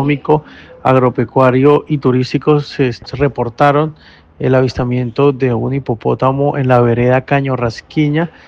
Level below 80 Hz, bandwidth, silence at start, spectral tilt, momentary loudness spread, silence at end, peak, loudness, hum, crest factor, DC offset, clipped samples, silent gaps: -42 dBFS; 7.2 kHz; 0 s; -8.5 dB/octave; 6 LU; 0.2 s; 0 dBFS; -14 LUFS; none; 14 dB; under 0.1%; under 0.1%; none